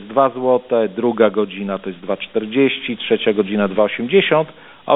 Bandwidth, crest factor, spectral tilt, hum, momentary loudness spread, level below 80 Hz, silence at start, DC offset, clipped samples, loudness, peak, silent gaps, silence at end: 4 kHz; 16 dB; -11 dB/octave; none; 9 LU; -60 dBFS; 0 s; under 0.1%; under 0.1%; -18 LUFS; -2 dBFS; none; 0 s